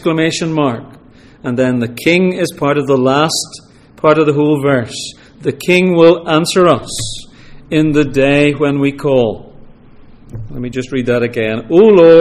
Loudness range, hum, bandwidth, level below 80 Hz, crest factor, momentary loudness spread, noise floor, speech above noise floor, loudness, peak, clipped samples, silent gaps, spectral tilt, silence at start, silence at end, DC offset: 3 LU; none; 15.5 kHz; -40 dBFS; 12 dB; 15 LU; -38 dBFS; 27 dB; -12 LUFS; 0 dBFS; 0.1%; none; -5.5 dB/octave; 0 s; 0 s; under 0.1%